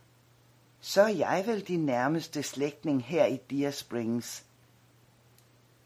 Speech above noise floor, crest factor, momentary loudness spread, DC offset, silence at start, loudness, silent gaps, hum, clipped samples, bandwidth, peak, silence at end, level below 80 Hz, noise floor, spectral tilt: 33 dB; 22 dB; 9 LU; under 0.1%; 0.85 s; -30 LUFS; none; none; under 0.1%; 16 kHz; -8 dBFS; 1.45 s; -76 dBFS; -62 dBFS; -5 dB/octave